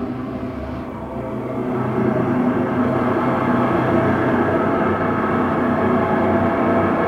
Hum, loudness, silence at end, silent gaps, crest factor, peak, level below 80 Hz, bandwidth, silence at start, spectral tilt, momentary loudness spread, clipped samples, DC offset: none; -19 LUFS; 0 s; none; 14 dB; -6 dBFS; -44 dBFS; 7.8 kHz; 0 s; -9 dB/octave; 10 LU; under 0.1%; under 0.1%